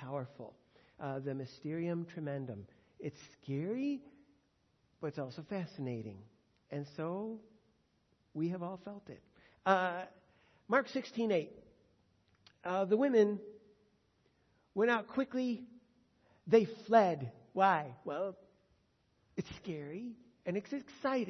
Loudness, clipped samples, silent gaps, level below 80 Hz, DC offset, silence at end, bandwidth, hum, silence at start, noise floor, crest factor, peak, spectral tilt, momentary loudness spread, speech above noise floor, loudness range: -36 LUFS; under 0.1%; none; -78 dBFS; under 0.1%; 0 s; 6.2 kHz; none; 0 s; -75 dBFS; 24 dB; -14 dBFS; -5.5 dB/octave; 19 LU; 40 dB; 10 LU